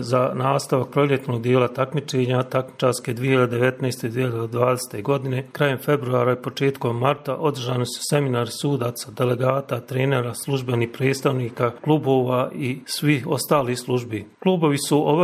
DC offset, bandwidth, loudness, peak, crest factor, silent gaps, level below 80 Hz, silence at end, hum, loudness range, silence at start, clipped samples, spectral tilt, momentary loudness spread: under 0.1%; 15.5 kHz; -22 LUFS; -2 dBFS; 20 dB; none; -64 dBFS; 0 s; none; 2 LU; 0 s; under 0.1%; -6 dB/octave; 5 LU